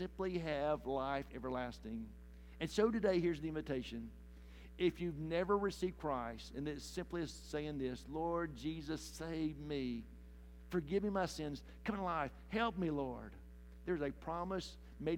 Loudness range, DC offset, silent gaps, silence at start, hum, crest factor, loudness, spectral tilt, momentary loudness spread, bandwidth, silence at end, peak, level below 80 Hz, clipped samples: 4 LU; under 0.1%; none; 0 s; none; 20 dB; -41 LUFS; -6 dB/octave; 16 LU; 17 kHz; 0 s; -22 dBFS; -56 dBFS; under 0.1%